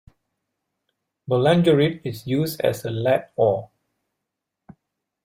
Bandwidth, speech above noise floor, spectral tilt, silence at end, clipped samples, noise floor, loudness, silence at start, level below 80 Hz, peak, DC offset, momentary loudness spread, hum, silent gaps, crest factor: 16 kHz; 62 dB; -6.5 dB/octave; 1.6 s; under 0.1%; -82 dBFS; -21 LUFS; 1.3 s; -60 dBFS; -6 dBFS; under 0.1%; 10 LU; none; none; 18 dB